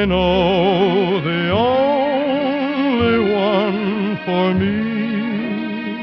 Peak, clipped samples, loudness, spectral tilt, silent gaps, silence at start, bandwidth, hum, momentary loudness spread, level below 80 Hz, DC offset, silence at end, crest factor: -4 dBFS; under 0.1%; -17 LUFS; -8.5 dB/octave; none; 0 s; 6 kHz; none; 6 LU; -40 dBFS; under 0.1%; 0 s; 12 dB